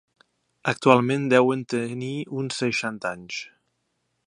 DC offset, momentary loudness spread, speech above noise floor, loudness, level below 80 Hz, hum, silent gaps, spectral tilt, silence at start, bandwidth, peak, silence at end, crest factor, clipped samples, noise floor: under 0.1%; 14 LU; 51 dB; -24 LUFS; -68 dBFS; none; none; -5.5 dB/octave; 0.65 s; 11 kHz; -2 dBFS; 0.8 s; 24 dB; under 0.1%; -75 dBFS